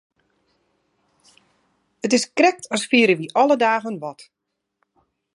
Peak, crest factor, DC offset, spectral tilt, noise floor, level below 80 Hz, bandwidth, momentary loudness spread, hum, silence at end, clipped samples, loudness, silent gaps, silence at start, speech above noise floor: -2 dBFS; 20 dB; under 0.1%; -3.5 dB/octave; -79 dBFS; -74 dBFS; 11.5 kHz; 14 LU; none; 1.15 s; under 0.1%; -19 LUFS; none; 2.05 s; 61 dB